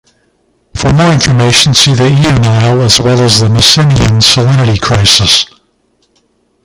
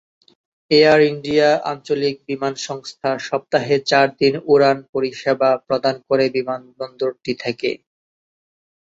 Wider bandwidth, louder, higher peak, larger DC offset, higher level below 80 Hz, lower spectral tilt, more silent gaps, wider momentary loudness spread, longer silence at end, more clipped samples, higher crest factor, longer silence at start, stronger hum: first, 16 kHz vs 7.8 kHz; first, -6 LUFS vs -18 LUFS; about the same, 0 dBFS vs -2 dBFS; neither; first, -28 dBFS vs -60 dBFS; about the same, -4 dB/octave vs -5 dB/octave; second, none vs 4.89-4.93 s; second, 4 LU vs 11 LU; first, 1.2 s vs 1.05 s; first, 0.6% vs under 0.1%; second, 8 dB vs 18 dB; about the same, 0.75 s vs 0.7 s; neither